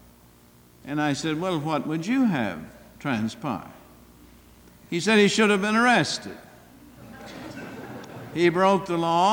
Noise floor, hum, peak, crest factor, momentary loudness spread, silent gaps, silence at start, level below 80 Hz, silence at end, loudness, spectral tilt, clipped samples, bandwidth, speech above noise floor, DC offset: -54 dBFS; none; -8 dBFS; 18 dB; 20 LU; none; 0.85 s; -60 dBFS; 0 s; -23 LUFS; -5 dB/octave; under 0.1%; 19 kHz; 31 dB; under 0.1%